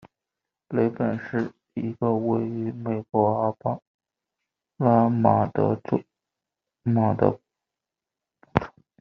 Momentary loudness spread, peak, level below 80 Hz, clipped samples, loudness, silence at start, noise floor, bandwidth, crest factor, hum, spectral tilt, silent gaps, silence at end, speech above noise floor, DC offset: 12 LU; 0 dBFS; -58 dBFS; under 0.1%; -25 LUFS; 0.05 s; -88 dBFS; 6 kHz; 26 dB; none; -9 dB/octave; 3.87-3.99 s; 0.3 s; 65 dB; under 0.1%